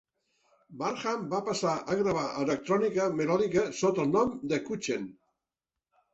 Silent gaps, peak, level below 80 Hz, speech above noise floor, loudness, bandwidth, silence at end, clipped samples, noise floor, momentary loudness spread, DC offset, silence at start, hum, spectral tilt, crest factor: none; -14 dBFS; -66 dBFS; 61 dB; -30 LUFS; 8.2 kHz; 1 s; under 0.1%; -90 dBFS; 7 LU; under 0.1%; 0.7 s; none; -5.5 dB/octave; 16 dB